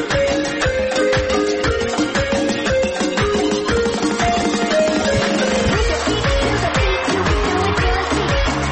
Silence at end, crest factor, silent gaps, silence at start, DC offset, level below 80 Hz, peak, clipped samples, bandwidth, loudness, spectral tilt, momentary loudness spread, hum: 0 s; 12 dB; none; 0 s; under 0.1%; -28 dBFS; -6 dBFS; under 0.1%; 8.8 kHz; -17 LUFS; -4.5 dB/octave; 2 LU; none